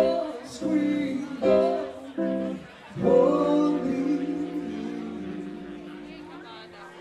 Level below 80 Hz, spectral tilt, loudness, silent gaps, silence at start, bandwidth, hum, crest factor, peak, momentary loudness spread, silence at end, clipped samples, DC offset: -60 dBFS; -7 dB/octave; -26 LUFS; none; 0 s; 10.5 kHz; none; 18 dB; -10 dBFS; 20 LU; 0 s; under 0.1%; under 0.1%